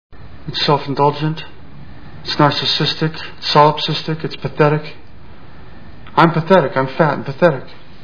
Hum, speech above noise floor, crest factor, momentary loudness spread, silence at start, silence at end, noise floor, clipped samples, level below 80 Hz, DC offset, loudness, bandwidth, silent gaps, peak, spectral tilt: none; 25 dB; 18 dB; 13 LU; 0.1 s; 0.3 s; -40 dBFS; under 0.1%; -46 dBFS; 3%; -16 LUFS; 5.4 kHz; none; 0 dBFS; -6.5 dB/octave